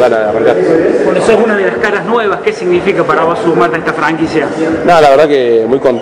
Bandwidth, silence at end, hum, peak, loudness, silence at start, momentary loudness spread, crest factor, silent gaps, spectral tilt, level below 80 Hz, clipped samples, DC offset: 10.5 kHz; 0 s; none; 0 dBFS; -10 LUFS; 0 s; 6 LU; 10 dB; none; -6 dB/octave; -44 dBFS; 2%; under 0.1%